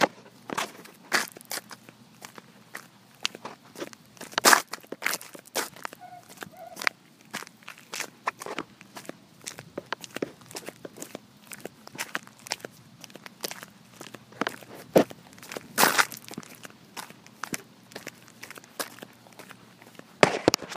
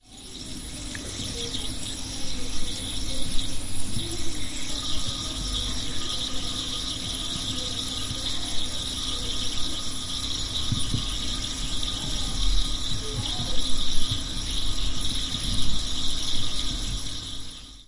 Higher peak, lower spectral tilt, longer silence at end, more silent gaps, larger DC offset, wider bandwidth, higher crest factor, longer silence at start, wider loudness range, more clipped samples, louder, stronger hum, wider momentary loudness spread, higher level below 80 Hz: first, 0 dBFS vs -6 dBFS; about the same, -2 dB/octave vs -2.5 dB/octave; about the same, 0 s vs 0.05 s; neither; neither; first, 15.5 kHz vs 11.5 kHz; first, 32 dB vs 18 dB; about the same, 0 s vs 0.05 s; first, 12 LU vs 3 LU; neither; about the same, -29 LUFS vs -29 LUFS; neither; first, 23 LU vs 5 LU; second, -70 dBFS vs -34 dBFS